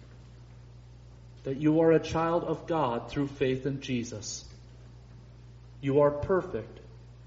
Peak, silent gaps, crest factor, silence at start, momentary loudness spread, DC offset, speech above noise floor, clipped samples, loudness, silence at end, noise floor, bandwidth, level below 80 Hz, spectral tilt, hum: -12 dBFS; none; 18 dB; 0 s; 17 LU; under 0.1%; 22 dB; under 0.1%; -29 LUFS; 0 s; -50 dBFS; 7.6 kHz; -54 dBFS; -6 dB/octave; none